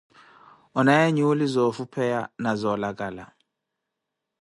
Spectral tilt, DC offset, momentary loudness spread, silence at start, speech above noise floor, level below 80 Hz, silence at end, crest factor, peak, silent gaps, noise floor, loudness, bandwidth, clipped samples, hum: -6.5 dB/octave; under 0.1%; 13 LU; 0.75 s; 60 dB; -64 dBFS; 1.15 s; 20 dB; -6 dBFS; none; -83 dBFS; -24 LUFS; 11.5 kHz; under 0.1%; none